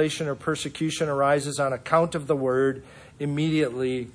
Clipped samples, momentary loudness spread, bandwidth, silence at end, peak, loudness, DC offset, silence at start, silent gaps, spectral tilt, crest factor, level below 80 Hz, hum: under 0.1%; 6 LU; 10.5 kHz; 0.05 s; -8 dBFS; -25 LUFS; under 0.1%; 0 s; none; -5.5 dB/octave; 18 dB; -58 dBFS; none